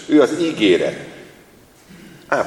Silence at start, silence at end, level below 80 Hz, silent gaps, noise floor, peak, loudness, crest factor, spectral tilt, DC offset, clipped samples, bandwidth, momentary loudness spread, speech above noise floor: 0 s; 0 s; -60 dBFS; none; -48 dBFS; 0 dBFS; -17 LUFS; 18 dB; -5 dB/octave; under 0.1%; under 0.1%; 12 kHz; 18 LU; 32 dB